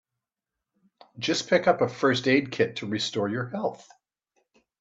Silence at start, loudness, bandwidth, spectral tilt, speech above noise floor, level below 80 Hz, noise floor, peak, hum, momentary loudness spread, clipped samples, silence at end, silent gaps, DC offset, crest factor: 1.15 s; -26 LUFS; 8 kHz; -4.5 dB/octave; 62 dB; -70 dBFS; -87 dBFS; -6 dBFS; none; 9 LU; under 0.1%; 1 s; none; under 0.1%; 22 dB